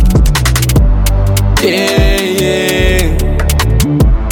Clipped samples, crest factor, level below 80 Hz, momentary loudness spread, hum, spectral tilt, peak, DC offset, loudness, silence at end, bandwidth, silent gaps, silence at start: under 0.1%; 10 dB; -12 dBFS; 2 LU; none; -5 dB/octave; 0 dBFS; under 0.1%; -11 LUFS; 0 s; 19 kHz; none; 0 s